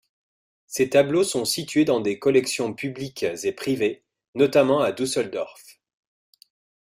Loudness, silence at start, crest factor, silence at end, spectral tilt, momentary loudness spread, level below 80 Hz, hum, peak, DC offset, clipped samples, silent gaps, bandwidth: -23 LUFS; 0.7 s; 18 dB; 1.2 s; -4.5 dB/octave; 12 LU; -64 dBFS; none; -6 dBFS; under 0.1%; under 0.1%; 4.28-4.33 s; 16 kHz